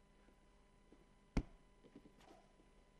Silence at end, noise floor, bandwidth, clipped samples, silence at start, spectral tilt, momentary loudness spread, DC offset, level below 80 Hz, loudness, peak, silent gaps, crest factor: 0.2 s; -69 dBFS; 11 kHz; under 0.1%; 0.9 s; -7 dB/octave; 23 LU; under 0.1%; -56 dBFS; -48 LUFS; -22 dBFS; none; 30 dB